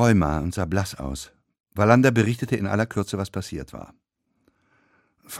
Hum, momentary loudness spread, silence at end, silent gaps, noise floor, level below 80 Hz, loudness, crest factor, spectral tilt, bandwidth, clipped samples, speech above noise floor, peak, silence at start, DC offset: none; 19 LU; 0 s; 1.60-1.64 s; -68 dBFS; -42 dBFS; -23 LUFS; 22 dB; -6.5 dB/octave; 15.5 kHz; under 0.1%; 46 dB; -2 dBFS; 0 s; under 0.1%